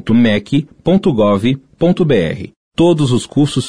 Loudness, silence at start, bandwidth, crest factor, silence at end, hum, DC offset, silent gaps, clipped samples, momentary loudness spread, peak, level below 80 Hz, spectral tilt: -14 LUFS; 0 s; 10.5 kHz; 10 dB; 0 s; none; under 0.1%; 2.56-2.71 s; under 0.1%; 6 LU; -2 dBFS; -40 dBFS; -7 dB/octave